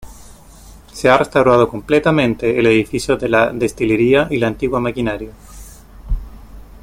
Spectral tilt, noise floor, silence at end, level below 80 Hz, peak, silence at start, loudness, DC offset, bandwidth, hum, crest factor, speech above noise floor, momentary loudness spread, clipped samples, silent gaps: -6 dB/octave; -40 dBFS; 0.05 s; -34 dBFS; 0 dBFS; 0 s; -15 LUFS; under 0.1%; 16.5 kHz; none; 16 dB; 26 dB; 15 LU; under 0.1%; none